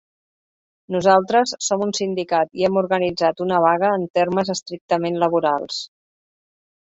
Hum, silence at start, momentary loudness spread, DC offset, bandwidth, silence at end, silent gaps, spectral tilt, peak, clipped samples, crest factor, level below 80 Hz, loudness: none; 0.9 s; 8 LU; under 0.1%; 8 kHz; 1.1 s; 4.10-4.14 s, 4.81-4.89 s; -4.5 dB/octave; -2 dBFS; under 0.1%; 20 dB; -62 dBFS; -20 LUFS